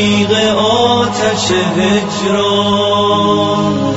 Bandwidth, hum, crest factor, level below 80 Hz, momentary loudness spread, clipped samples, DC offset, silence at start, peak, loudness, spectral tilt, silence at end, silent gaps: 8 kHz; none; 12 dB; -46 dBFS; 3 LU; under 0.1%; under 0.1%; 0 s; 0 dBFS; -12 LUFS; -4.5 dB/octave; 0 s; none